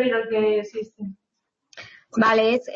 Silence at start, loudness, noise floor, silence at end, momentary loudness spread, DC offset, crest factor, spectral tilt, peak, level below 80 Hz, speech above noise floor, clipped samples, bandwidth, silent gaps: 0 s; -21 LUFS; -79 dBFS; 0 s; 24 LU; under 0.1%; 16 dB; -5.5 dB/octave; -8 dBFS; -66 dBFS; 57 dB; under 0.1%; 7.4 kHz; none